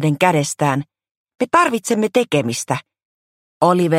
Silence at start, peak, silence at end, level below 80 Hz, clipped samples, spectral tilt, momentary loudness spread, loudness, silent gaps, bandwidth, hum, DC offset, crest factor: 0 s; 0 dBFS; 0 s; -62 dBFS; under 0.1%; -5 dB/octave; 9 LU; -18 LUFS; 1.11-1.25 s, 3.05-3.61 s; 16 kHz; none; under 0.1%; 18 dB